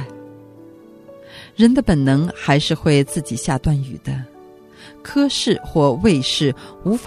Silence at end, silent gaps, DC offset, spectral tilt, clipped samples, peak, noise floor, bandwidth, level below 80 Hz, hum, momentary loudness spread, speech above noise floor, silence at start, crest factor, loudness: 0 s; none; under 0.1%; -5.5 dB/octave; under 0.1%; 0 dBFS; -43 dBFS; 13.5 kHz; -38 dBFS; none; 17 LU; 26 dB; 0 s; 18 dB; -18 LUFS